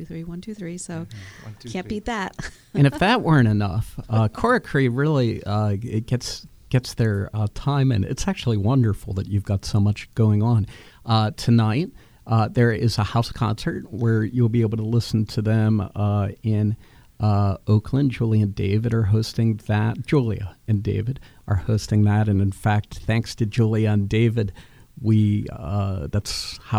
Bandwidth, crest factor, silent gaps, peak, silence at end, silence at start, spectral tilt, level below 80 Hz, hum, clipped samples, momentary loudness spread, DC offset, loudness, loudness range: 12 kHz; 18 dB; none; -4 dBFS; 0 s; 0 s; -7 dB/octave; -42 dBFS; none; under 0.1%; 11 LU; under 0.1%; -22 LUFS; 2 LU